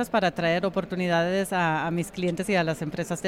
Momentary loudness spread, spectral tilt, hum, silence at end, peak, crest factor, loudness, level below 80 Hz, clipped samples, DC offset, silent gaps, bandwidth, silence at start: 5 LU; -5.5 dB/octave; none; 0 s; -12 dBFS; 14 dB; -26 LUFS; -56 dBFS; under 0.1%; under 0.1%; none; 15.5 kHz; 0 s